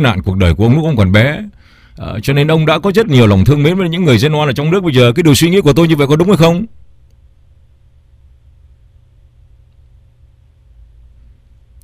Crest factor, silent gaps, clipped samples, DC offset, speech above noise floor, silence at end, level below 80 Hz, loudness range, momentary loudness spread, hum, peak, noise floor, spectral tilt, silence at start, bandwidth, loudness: 12 dB; none; under 0.1%; under 0.1%; 36 dB; 5.15 s; -34 dBFS; 6 LU; 9 LU; none; 0 dBFS; -46 dBFS; -6.5 dB/octave; 0 s; 16 kHz; -10 LUFS